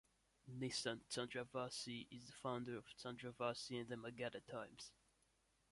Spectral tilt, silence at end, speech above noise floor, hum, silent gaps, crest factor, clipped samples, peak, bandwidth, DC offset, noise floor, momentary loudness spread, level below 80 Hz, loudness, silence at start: -4 dB/octave; 0.8 s; 32 dB; none; none; 22 dB; under 0.1%; -28 dBFS; 11.5 kHz; under 0.1%; -81 dBFS; 11 LU; -80 dBFS; -49 LUFS; 0.45 s